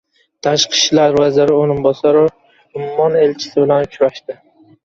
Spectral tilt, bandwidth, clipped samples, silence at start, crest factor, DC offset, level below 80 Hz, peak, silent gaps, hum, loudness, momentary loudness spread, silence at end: -4 dB/octave; 7.8 kHz; under 0.1%; 0.45 s; 14 dB; under 0.1%; -52 dBFS; 0 dBFS; none; none; -14 LUFS; 14 LU; 0.5 s